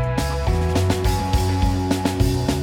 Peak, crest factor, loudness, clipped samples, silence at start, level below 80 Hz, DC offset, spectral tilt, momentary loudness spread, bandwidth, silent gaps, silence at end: -4 dBFS; 16 dB; -21 LUFS; under 0.1%; 0 s; -26 dBFS; under 0.1%; -6 dB/octave; 2 LU; 17.5 kHz; none; 0 s